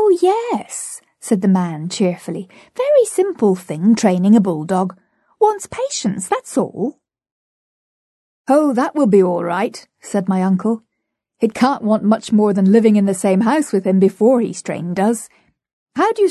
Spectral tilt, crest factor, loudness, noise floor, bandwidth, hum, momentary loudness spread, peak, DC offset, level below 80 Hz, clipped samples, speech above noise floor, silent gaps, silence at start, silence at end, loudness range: -6.5 dB/octave; 14 dB; -16 LUFS; -76 dBFS; 12.5 kHz; none; 12 LU; -2 dBFS; under 0.1%; -62 dBFS; under 0.1%; 61 dB; 7.32-8.44 s, 15.73-15.86 s; 0 s; 0 s; 6 LU